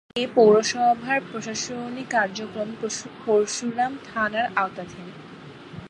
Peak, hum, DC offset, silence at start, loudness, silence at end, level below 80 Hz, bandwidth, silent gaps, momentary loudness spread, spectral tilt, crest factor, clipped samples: -4 dBFS; none; under 0.1%; 0.15 s; -23 LUFS; 0 s; -64 dBFS; 10.5 kHz; none; 21 LU; -3.5 dB/octave; 20 dB; under 0.1%